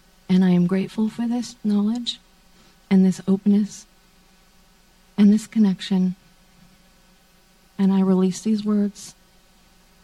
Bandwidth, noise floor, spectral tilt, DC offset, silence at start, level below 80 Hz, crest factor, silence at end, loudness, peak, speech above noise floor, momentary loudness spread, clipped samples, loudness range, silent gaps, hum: 11.5 kHz; -56 dBFS; -7 dB/octave; under 0.1%; 0.3 s; -58 dBFS; 16 dB; 0.95 s; -21 LUFS; -6 dBFS; 36 dB; 14 LU; under 0.1%; 3 LU; none; none